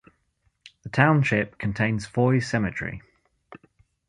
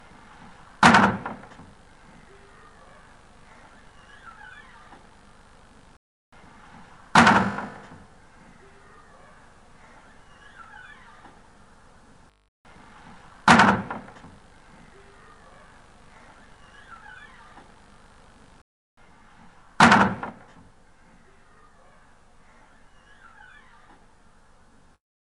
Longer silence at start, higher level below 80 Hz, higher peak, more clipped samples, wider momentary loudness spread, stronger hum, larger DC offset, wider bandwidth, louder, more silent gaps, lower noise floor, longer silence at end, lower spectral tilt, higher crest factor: about the same, 0.85 s vs 0.8 s; about the same, -52 dBFS vs -54 dBFS; about the same, -2 dBFS vs 0 dBFS; neither; second, 15 LU vs 31 LU; neither; neither; about the same, 11 kHz vs 11.5 kHz; second, -24 LUFS vs -19 LUFS; second, none vs 5.97-6.32 s, 12.48-12.64 s, 18.61-18.97 s; first, -70 dBFS vs -55 dBFS; second, 0.55 s vs 4.95 s; first, -7 dB/octave vs -4.5 dB/octave; about the same, 24 dB vs 28 dB